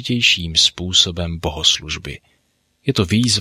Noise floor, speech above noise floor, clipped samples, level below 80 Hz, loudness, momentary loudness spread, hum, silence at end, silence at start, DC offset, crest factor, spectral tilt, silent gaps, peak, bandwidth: -64 dBFS; 46 dB; under 0.1%; -38 dBFS; -16 LUFS; 13 LU; none; 0 s; 0 s; under 0.1%; 18 dB; -3 dB/octave; none; 0 dBFS; 16 kHz